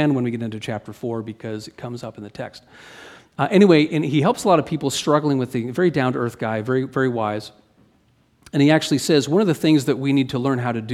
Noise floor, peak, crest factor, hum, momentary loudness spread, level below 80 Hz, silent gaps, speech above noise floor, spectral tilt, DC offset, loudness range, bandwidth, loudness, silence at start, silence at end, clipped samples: -60 dBFS; -2 dBFS; 18 dB; none; 16 LU; -60 dBFS; none; 40 dB; -6 dB/octave; under 0.1%; 5 LU; 14.5 kHz; -20 LUFS; 0 s; 0 s; under 0.1%